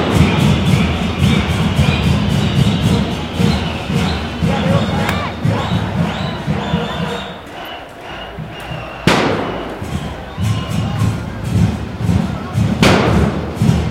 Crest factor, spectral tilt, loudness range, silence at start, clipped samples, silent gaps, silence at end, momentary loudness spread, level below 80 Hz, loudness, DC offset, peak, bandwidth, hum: 16 dB; -6 dB/octave; 6 LU; 0 s; under 0.1%; none; 0 s; 13 LU; -28 dBFS; -16 LUFS; under 0.1%; 0 dBFS; 16 kHz; none